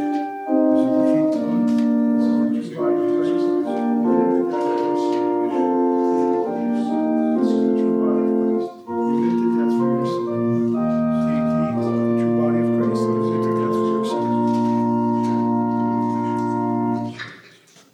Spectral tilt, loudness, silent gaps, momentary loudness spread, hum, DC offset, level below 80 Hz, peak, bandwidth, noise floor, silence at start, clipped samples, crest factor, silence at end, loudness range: -8.5 dB/octave; -20 LUFS; none; 4 LU; none; under 0.1%; -62 dBFS; -8 dBFS; 9.4 kHz; -49 dBFS; 0 s; under 0.1%; 12 dB; 0.55 s; 1 LU